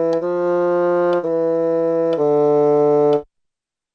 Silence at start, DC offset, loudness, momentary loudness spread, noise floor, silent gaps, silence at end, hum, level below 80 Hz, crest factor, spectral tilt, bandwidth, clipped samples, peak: 0 s; under 0.1%; -17 LUFS; 5 LU; -79 dBFS; none; 0.7 s; none; -62 dBFS; 10 dB; -9 dB/octave; 6.6 kHz; under 0.1%; -6 dBFS